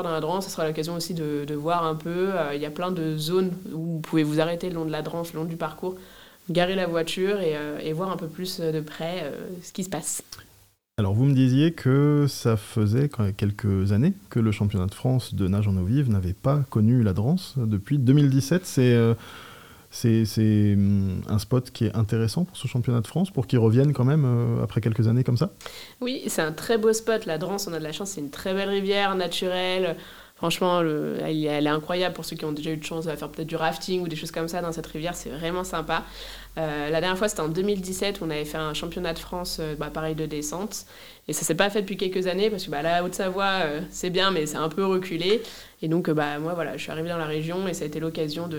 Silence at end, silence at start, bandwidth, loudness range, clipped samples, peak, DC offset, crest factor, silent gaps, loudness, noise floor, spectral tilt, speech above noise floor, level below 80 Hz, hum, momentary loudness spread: 0 s; 0 s; 18 kHz; 6 LU; under 0.1%; -4 dBFS; 0.2%; 20 dB; none; -25 LUFS; -58 dBFS; -6 dB/octave; 33 dB; -52 dBFS; none; 10 LU